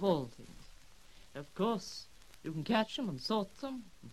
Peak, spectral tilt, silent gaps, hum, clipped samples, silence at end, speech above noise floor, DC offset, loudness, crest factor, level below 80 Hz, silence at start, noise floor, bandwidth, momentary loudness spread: -16 dBFS; -5.5 dB/octave; none; none; under 0.1%; 0 s; 24 dB; 0.1%; -37 LUFS; 22 dB; -62 dBFS; 0 s; -60 dBFS; 15 kHz; 21 LU